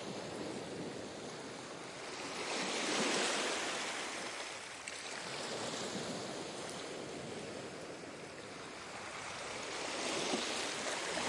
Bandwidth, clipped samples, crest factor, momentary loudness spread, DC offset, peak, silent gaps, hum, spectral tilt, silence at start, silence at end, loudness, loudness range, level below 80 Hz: 11.5 kHz; under 0.1%; 20 dB; 12 LU; under 0.1%; -20 dBFS; none; none; -2 dB/octave; 0 s; 0 s; -40 LUFS; 7 LU; -76 dBFS